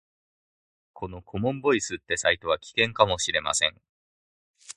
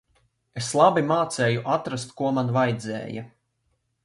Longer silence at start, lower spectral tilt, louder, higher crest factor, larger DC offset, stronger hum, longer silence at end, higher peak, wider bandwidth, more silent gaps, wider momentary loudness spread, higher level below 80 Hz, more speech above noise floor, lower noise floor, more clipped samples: first, 0.95 s vs 0.55 s; second, -2.5 dB/octave vs -5.5 dB/octave; about the same, -25 LUFS vs -24 LUFS; first, 26 dB vs 20 dB; neither; neither; second, 0.05 s vs 0.8 s; about the same, -2 dBFS vs -4 dBFS; about the same, 11.5 kHz vs 11.5 kHz; first, 3.89-4.54 s vs none; about the same, 14 LU vs 14 LU; first, -54 dBFS vs -64 dBFS; first, over 64 dB vs 49 dB; first, under -90 dBFS vs -73 dBFS; neither